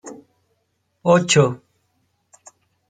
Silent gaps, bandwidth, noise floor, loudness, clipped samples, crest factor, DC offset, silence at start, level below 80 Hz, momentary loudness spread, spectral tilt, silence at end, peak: none; 9.4 kHz; -70 dBFS; -17 LUFS; under 0.1%; 20 dB; under 0.1%; 0.05 s; -64 dBFS; 23 LU; -4.5 dB/octave; 1.35 s; -2 dBFS